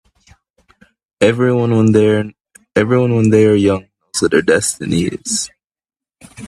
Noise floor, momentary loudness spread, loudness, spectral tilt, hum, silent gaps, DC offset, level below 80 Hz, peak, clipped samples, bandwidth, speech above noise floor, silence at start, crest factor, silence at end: under -90 dBFS; 9 LU; -14 LUFS; -5.5 dB/octave; none; none; under 0.1%; -50 dBFS; 0 dBFS; under 0.1%; 13 kHz; over 77 dB; 1.2 s; 16 dB; 0 s